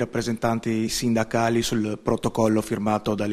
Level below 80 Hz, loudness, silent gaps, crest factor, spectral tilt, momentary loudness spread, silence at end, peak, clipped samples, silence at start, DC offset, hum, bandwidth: -48 dBFS; -24 LUFS; none; 16 dB; -5 dB/octave; 3 LU; 0 s; -6 dBFS; under 0.1%; 0 s; under 0.1%; none; 14.5 kHz